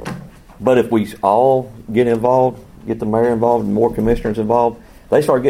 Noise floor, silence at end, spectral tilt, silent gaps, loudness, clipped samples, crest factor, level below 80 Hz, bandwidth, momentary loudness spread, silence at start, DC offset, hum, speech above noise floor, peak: -35 dBFS; 0 s; -7.5 dB/octave; none; -16 LUFS; under 0.1%; 16 dB; -38 dBFS; 16 kHz; 8 LU; 0 s; under 0.1%; none; 20 dB; 0 dBFS